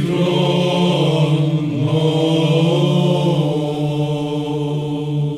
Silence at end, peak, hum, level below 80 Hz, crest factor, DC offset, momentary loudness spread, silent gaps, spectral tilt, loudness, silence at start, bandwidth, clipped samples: 0 s; -4 dBFS; none; -52 dBFS; 12 dB; under 0.1%; 6 LU; none; -7 dB/octave; -17 LUFS; 0 s; 11.5 kHz; under 0.1%